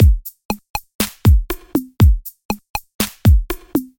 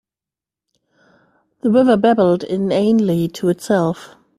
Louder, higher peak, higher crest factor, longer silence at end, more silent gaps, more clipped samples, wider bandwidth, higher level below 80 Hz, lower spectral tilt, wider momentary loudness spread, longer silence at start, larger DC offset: about the same, -18 LUFS vs -16 LUFS; about the same, 0 dBFS vs -2 dBFS; about the same, 16 dB vs 16 dB; second, 0.15 s vs 0.3 s; first, 0.45-0.49 s, 0.70-0.74 s, 0.95-0.99 s, 2.45-2.49 s, 2.70-2.74 s, 2.95-2.99 s vs none; neither; first, 17 kHz vs 14 kHz; first, -20 dBFS vs -58 dBFS; about the same, -6 dB/octave vs -7 dB/octave; first, 12 LU vs 8 LU; second, 0 s vs 1.65 s; neither